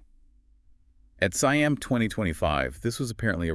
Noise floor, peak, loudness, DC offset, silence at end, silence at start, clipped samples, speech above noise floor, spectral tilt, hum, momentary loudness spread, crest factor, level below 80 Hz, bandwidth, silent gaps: -58 dBFS; -8 dBFS; -26 LUFS; under 0.1%; 0 s; 1.2 s; under 0.1%; 33 dB; -5 dB/octave; none; 7 LU; 20 dB; -46 dBFS; 12 kHz; none